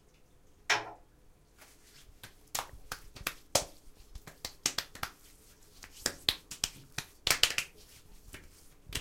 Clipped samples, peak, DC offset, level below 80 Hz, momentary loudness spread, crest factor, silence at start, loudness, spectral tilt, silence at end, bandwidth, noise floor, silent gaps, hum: under 0.1%; -4 dBFS; under 0.1%; -56 dBFS; 24 LU; 36 dB; 0.7 s; -34 LUFS; -0.5 dB/octave; 0 s; 17 kHz; -61 dBFS; none; none